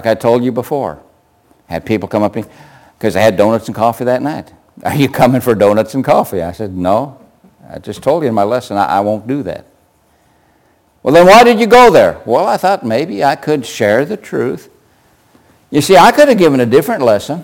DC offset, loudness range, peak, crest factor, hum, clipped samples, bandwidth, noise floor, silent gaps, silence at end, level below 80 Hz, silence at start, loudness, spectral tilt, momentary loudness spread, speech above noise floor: under 0.1%; 8 LU; 0 dBFS; 12 dB; none; under 0.1%; 17 kHz; -53 dBFS; none; 0 s; -44 dBFS; 0 s; -11 LUFS; -5.5 dB/octave; 16 LU; 42 dB